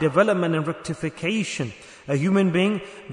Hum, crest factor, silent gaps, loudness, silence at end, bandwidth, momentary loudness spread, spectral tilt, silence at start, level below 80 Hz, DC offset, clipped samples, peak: none; 18 dB; none; -23 LUFS; 0 s; 10.5 kHz; 11 LU; -6 dB/octave; 0 s; -60 dBFS; under 0.1%; under 0.1%; -4 dBFS